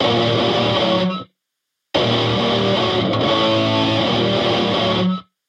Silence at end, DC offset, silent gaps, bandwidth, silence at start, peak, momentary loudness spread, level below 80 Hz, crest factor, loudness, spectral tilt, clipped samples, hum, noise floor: 0.25 s; under 0.1%; none; 9.8 kHz; 0 s; -4 dBFS; 4 LU; -48 dBFS; 14 dB; -17 LUFS; -6 dB/octave; under 0.1%; none; -78 dBFS